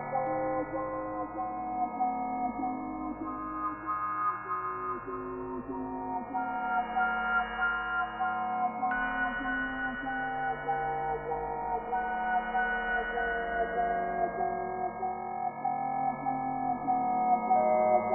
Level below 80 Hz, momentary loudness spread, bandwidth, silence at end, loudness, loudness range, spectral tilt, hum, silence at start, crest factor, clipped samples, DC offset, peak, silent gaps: -56 dBFS; 7 LU; 3.1 kHz; 0 s; -32 LUFS; 4 LU; 1 dB/octave; none; 0 s; 16 dB; under 0.1%; under 0.1%; -16 dBFS; none